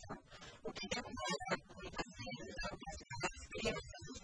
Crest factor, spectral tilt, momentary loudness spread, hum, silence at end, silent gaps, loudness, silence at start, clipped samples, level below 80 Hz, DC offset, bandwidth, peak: 20 dB; -3.5 dB/octave; 10 LU; none; 0 s; none; -44 LUFS; 0 s; under 0.1%; -58 dBFS; under 0.1%; 10.5 kHz; -26 dBFS